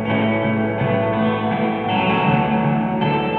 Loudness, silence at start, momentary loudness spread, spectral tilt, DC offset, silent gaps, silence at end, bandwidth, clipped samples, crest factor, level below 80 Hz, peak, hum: -19 LUFS; 0 s; 3 LU; -9.5 dB/octave; under 0.1%; none; 0 s; 4.4 kHz; under 0.1%; 12 dB; -48 dBFS; -6 dBFS; none